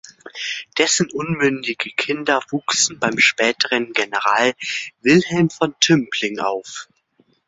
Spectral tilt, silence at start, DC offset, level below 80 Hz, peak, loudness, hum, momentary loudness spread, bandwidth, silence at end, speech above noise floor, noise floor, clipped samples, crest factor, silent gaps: -3 dB/octave; 0.25 s; under 0.1%; -62 dBFS; 0 dBFS; -18 LUFS; none; 10 LU; 8 kHz; 0.65 s; 41 dB; -61 dBFS; under 0.1%; 20 dB; none